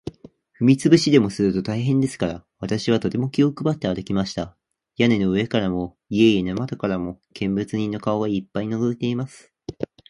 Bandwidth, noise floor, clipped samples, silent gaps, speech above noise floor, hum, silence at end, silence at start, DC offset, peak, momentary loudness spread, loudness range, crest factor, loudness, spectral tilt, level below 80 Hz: 11.5 kHz; -49 dBFS; under 0.1%; none; 28 dB; none; 0.25 s; 0.05 s; under 0.1%; -2 dBFS; 14 LU; 4 LU; 20 dB; -22 LUFS; -6.5 dB/octave; -50 dBFS